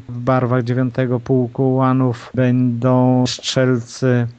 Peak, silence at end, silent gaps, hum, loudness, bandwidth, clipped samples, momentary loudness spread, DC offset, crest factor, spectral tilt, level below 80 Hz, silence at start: -2 dBFS; 0.05 s; none; none; -17 LUFS; 8.2 kHz; under 0.1%; 4 LU; under 0.1%; 14 dB; -7 dB/octave; -52 dBFS; 0.1 s